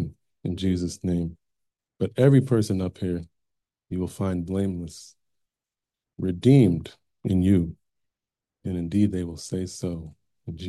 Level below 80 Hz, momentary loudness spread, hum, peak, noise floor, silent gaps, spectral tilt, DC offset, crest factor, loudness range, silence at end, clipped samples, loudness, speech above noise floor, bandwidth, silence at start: -44 dBFS; 17 LU; none; -6 dBFS; -90 dBFS; none; -7.5 dB/octave; under 0.1%; 20 dB; 7 LU; 0 s; under 0.1%; -25 LUFS; 66 dB; 12.5 kHz; 0 s